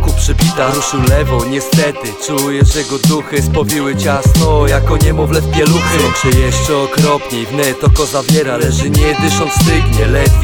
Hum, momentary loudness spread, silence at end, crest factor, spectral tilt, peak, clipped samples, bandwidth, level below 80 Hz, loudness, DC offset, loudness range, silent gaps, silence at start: none; 4 LU; 0 s; 10 dB; -5 dB/octave; 0 dBFS; under 0.1%; over 20 kHz; -18 dBFS; -12 LUFS; under 0.1%; 2 LU; none; 0 s